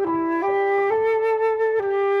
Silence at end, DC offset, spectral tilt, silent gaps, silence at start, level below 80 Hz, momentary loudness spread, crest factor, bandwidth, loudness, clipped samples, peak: 0 s; under 0.1%; -6.5 dB/octave; none; 0 s; -62 dBFS; 2 LU; 10 dB; 5.6 kHz; -21 LUFS; under 0.1%; -10 dBFS